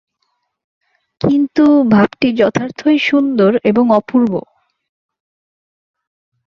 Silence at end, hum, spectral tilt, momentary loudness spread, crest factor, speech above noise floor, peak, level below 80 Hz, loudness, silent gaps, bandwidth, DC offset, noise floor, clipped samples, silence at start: 2.05 s; none; -7 dB/octave; 6 LU; 14 dB; 56 dB; -2 dBFS; -54 dBFS; -13 LUFS; none; 7 kHz; under 0.1%; -68 dBFS; under 0.1%; 1.25 s